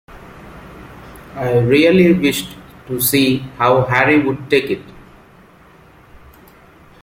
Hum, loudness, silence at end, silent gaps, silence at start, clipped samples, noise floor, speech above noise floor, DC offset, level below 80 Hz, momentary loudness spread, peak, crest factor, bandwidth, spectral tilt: none; -15 LUFS; 2.05 s; none; 0.1 s; under 0.1%; -45 dBFS; 31 dB; under 0.1%; -46 dBFS; 26 LU; 0 dBFS; 16 dB; 16.5 kHz; -5 dB/octave